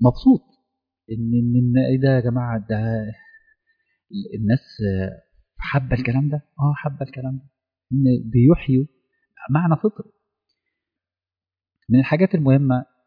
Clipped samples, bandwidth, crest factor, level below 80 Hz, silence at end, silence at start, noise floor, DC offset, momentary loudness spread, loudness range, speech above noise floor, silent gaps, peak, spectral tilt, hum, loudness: under 0.1%; 5.2 kHz; 16 dB; -44 dBFS; 0.25 s; 0 s; under -90 dBFS; under 0.1%; 14 LU; 5 LU; over 71 dB; none; -4 dBFS; -11 dB/octave; none; -20 LUFS